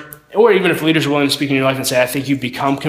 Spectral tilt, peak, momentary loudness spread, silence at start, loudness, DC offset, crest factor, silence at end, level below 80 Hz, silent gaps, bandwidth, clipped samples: -4.5 dB/octave; 0 dBFS; 7 LU; 0 s; -15 LUFS; under 0.1%; 14 dB; 0 s; -54 dBFS; none; 16 kHz; under 0.1%